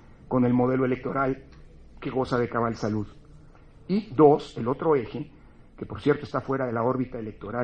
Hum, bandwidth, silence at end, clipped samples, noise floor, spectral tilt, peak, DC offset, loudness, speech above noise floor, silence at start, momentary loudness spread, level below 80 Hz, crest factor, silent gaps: none; 8.8 kHz; 0 s; under 0.1%; -50 dBFS; -8.5 dB/octave; -6 dBFS; under 0.1%; -26 LUFS; 25 dB; 0.3 s; 17 LU; -52 dBFS; 22 dB; none